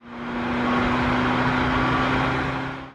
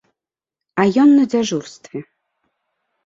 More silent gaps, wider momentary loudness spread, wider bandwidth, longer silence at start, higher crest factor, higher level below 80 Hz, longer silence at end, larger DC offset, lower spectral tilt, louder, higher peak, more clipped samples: neither; second, 7 LU vs 21 LU; first, 9.6 kHz vs 7.6 kHz; second, 0.05 s vs 0.75 s; about the same, 14 dB vs 16 dB; first, -38 dBFS vs -62 dBFS; second, 0 s vs 1.05 s; neither; about the same, -6.5 dB/octave vs -5.5 dB/octave; second, -22 LUFS vs -16 LUFS; second, -10 dBFS vs -2 dBFS; neither